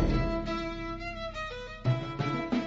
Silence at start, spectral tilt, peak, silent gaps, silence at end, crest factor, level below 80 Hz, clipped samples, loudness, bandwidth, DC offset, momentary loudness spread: 0 s; -7 dB/octave; -16 dBFS; none; 0 s; 16 dB; -38 dBFS; under 0.1%; -33 LUFS; 7.8 kHz; under 0.1%; 7 LU